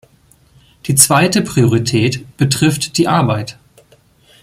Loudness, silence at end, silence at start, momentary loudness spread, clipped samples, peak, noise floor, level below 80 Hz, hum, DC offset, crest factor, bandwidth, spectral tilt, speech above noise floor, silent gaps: -13 LUFS; 0.9 s; 0.85 s; 9 LU; under 0.1%; 0 dBFS; -51 dBFS; -48 dBFS; none; under 0.1%; 16 dB; 16.5 kHz; -4 dB/octave; 37 dB; none